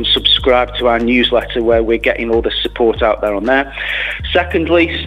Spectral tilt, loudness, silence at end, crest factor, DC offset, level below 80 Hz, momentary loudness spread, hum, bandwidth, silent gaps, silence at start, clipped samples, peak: -6 dB/octave; -14 LUFS; 0 s; 14 dB; under 0.1%; -30 dBFS; 6 LU; none; 13 kHz; none; 0 s; under 0.1%; 0 dBFS